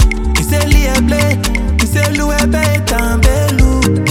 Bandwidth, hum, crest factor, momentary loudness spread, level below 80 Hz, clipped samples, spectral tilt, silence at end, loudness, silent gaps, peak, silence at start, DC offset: 17 kHz; none; 12 dB; 3 LU; -14 dBFS; under 0.1%; -5 dB/octave; 0 s; -13 LUFS; none; 0 dBFS; 0 s; under 0.1%